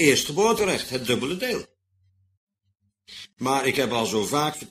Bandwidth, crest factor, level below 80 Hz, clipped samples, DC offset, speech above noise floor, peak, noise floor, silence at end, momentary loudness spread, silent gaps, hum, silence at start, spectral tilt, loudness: 15.5 kHz; 20 dB; -58 dBFS; under 0.1%; under 0.1%; 49 dB; -6 dBFS; -73 dBFS; 0.05 s; 11 LU; 2.37-2.47 s; none; 0 s; -3.5 dB/octave; -24 LUFS